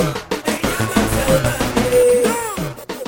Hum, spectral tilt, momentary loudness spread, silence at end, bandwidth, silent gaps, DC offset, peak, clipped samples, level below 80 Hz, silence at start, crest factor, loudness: none; -4.5 dB/octave; 9 LU; 0 s; 17.5 kHz; none; under 0.1%; -2 dBFS; under 0.1%; -32 dBFS; 0 s; 16 dB; -17 LUFS